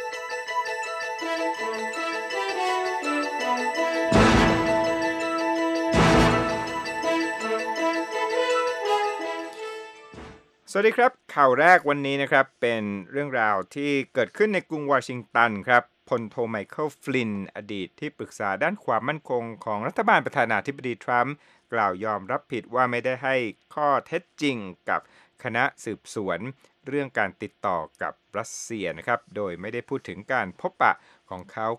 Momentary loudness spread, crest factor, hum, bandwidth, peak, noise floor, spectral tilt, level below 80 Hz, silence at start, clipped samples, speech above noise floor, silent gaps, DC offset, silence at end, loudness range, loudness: 13 LU; 22 dB; none; 15 kHz; -2 dBFS; -46 dBFS; -5 dB/octave; -46 dBFS; 0 s; under 0.1%; 21 dB; none; under 0.1%; 0 s; 8 LU; -25 LUFS